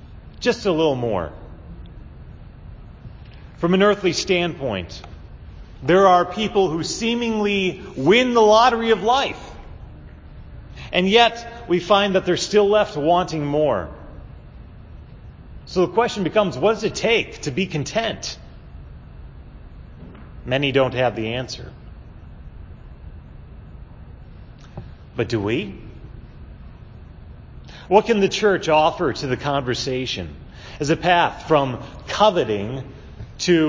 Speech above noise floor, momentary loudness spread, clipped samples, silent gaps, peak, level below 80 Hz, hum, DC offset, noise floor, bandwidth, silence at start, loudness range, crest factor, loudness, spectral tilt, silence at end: 22 dB; 25 LU; under 0.1%; none; 0 dBFS; -42 dBFS; none; under 0.1%; -41 dBFS; 7.6 kHz; 0.05 s; 12 LU; 20 dB; -19 LUFS; -5 dB/octave; 0 s